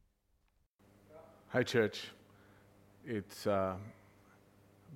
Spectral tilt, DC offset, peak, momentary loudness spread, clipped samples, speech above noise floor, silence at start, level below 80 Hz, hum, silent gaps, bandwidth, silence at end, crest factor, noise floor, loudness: -5.5 dB/octave; under 0.1%; -18 dBFS; 24 LU; under 0.1%; 41 dB; 1.1 s; -74 dBFS; none; none; 16.5 kHz; 0 s; 22 dB; -76 dBFS; -36 LUFS